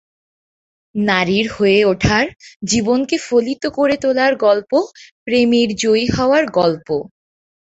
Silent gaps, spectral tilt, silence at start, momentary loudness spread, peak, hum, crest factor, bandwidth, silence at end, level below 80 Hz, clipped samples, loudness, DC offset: 2.56-2.60 s, 5.11-5.26 s; -4.5 dB/octave; 0.95 s; 9 LU; -2 dBFS; none; 16 dB; 8.2 kHz; 0.7 s; -42 dBFS; under 0.1%; -16 LUFS; under 0.1%